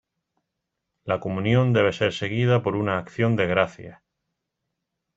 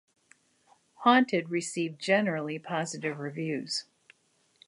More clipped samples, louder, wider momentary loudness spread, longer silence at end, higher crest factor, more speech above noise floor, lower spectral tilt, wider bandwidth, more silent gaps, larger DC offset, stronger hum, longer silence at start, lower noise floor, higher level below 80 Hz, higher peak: neither; first, -23 LUFS vs -29 LUFS; second, 8 LU vs 11 LU; first, 1.2 s vs 0.85 s; about the same, 22 dB vs 22 dB; first, 59 dB vs 41 dB; first, -7 dB/octave vs -4.5 dB/octave; second, 7.8 kHz vs 11.5 kHz; neither; neither; neither; about the same, 1.05 s vs 1 s; first, -81 dBFS vs -70 dBFS; first, -58 dBFS vs -82 dBFS; first, -4 dBFS vs -8 dBFS